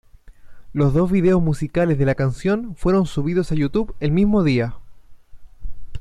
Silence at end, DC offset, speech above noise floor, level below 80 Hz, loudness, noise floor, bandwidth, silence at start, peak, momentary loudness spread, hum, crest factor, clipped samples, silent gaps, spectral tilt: 0 s; under 0.1%; 22 dB; -36 dBFS; -20 LUFS; -40 dBFS; 11 kHz; 0.25 s; -6 dBFS; 6 LU; none; 12 dB; under 0.1%; none; -8.5 dB/octave